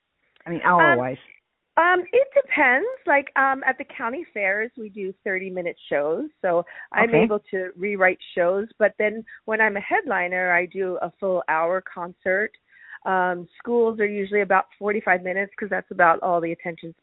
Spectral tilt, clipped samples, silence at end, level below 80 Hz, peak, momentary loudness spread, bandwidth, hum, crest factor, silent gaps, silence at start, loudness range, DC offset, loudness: -10 dB/octave; under 0.1%; 0.1 s; -66 dBFS; -2 dBFS; 11 LU; 4.1 kHz; none; 20 dB; none; 0.45 s; 4 LU; under 0.1%; -22 LUFS